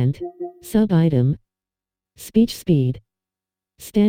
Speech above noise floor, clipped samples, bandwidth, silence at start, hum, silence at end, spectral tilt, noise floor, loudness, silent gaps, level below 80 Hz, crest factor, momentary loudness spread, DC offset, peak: 70 dB; under 0.1%; 16 kHz; 0 s; none; 0 s; -8 dB/octave; -89 dBFS; -20 LUFS; none; -48 dBFS; 16 dB; 17 LU; under 0.1%; -6 dBFS